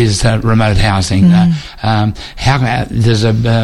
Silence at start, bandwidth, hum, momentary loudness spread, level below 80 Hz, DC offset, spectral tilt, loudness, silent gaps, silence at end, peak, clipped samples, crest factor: 0 s; 12 kHz; none; 6 LU; -26 dBFS; under 0.1%; -6 dB/octave; -12 LUFS; none; 0 s; 0 dBFS; under 0.1%; 10 dB